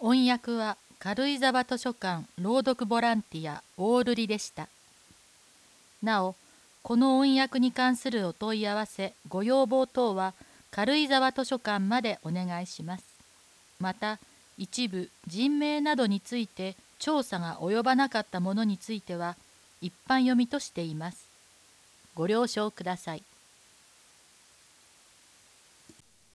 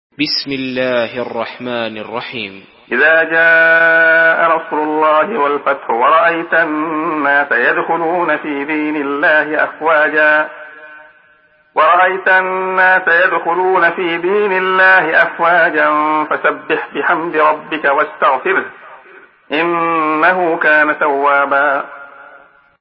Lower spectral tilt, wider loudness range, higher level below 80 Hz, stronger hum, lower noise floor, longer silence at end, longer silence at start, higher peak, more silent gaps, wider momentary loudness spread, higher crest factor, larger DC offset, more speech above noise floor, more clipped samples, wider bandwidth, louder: second, -5 dB/octave vs -7.5 dB/octave; first, 7 LU vs 4 LU; second, -72 dBFS vs -64 dBFS; neither; first, -59 dBFS vs -51 dBFS; first, 3.2 s vs 0.45 s; second, 0 s vs 0.2 s; second, -10 dBFS vs 0 dBFS; neither; first, 14 LU vs 11 LU; first, 20 dB vs 14 dB; neither; second, 31 dB vs 38 dB; neither; first, 11 kHz vs 5.8 kHz; second, -29 LUFS vs -13 LUFS